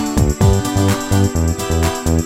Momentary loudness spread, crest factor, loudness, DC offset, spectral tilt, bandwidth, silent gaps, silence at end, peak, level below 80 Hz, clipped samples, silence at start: 3 LU; 14 dB; -16 LUFS; under 0.1%; -5.5 dB/octave; 16.5 kHz; none; 0 s; 0 dBFS; -24 dBFS; under 0.1%; 0 s